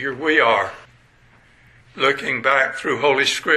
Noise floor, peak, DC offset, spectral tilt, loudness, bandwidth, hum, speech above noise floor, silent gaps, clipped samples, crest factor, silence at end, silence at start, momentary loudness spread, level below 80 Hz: -53 dBFS; -2 dBFS; under 0.1%; -3 dB/octave; -18 LUFS; 12.5 kHz; none; 34 dB; none; under 0.1%; 18 dB; 0 s; 0 s; 5 LU; -60 dBFS